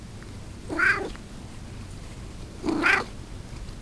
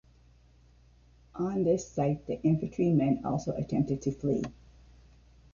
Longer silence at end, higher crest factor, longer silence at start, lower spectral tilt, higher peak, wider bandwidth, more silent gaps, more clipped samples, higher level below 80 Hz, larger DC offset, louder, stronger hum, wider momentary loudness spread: second, 0 s vs 1 s; first, 24 dB vs 16 dB; second, 0 s vs 1.35 s; second, -4.5 dB/octave vs -8.5 dB/octave; first, -6 dBFS vs -16 dBFS; first, 11 kHz vs 7.2 kHz; neither; neither; first, -42 dBFS vs -56 dBFS; neither; first, -25 LUFS vs -30 LUFS; neither; first, 19 LU vs 7 LU